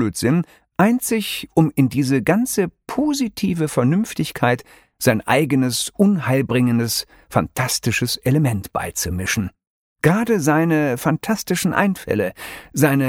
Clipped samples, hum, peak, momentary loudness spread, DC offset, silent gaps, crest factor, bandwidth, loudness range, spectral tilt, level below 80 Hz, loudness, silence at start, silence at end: under 0.1%; none; -2 dBFS; 7 LU; under 0.1%; 9.67-9.96 s; 18 dB; 18 kHz; 1 LU; -5 dB/octave; -48 dBFS; -19 LUFS; 0 s; 0 s